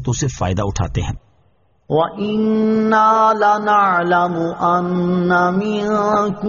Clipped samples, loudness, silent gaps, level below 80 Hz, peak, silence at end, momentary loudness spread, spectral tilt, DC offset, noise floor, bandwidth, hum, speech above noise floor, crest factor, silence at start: under 0.1%; -16 LUFS; none; -38 dBFS; -2 dBFS; 0 s; 8 LU; -5.5 dB/octave; under 0.1%; -58 dBFS; 7.2 kHz; none; 42 dB; 14 dB; 0 s